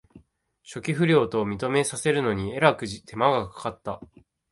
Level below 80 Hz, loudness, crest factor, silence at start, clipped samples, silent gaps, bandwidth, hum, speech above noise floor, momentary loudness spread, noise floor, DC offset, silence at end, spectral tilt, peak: -54 dBFS; -24 LUFS; 22 dB; 0.15 s; under 0.1%; none; 11.5 kHz; none; 35 dB; 14 LU; -59 dBFS; under 0.1%; 0.45 s; -5 dB/octave; -4 dBFS